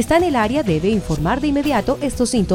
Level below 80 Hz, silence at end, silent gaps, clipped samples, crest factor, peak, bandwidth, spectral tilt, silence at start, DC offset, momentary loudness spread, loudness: -34 dBFS; 0 s; none; under 0.1%; 16 dB; -2 dBFS; 18.5 kHz; -5.5 dB/octave; 0 s; under 0.1%; 4 LU; -18 LUFS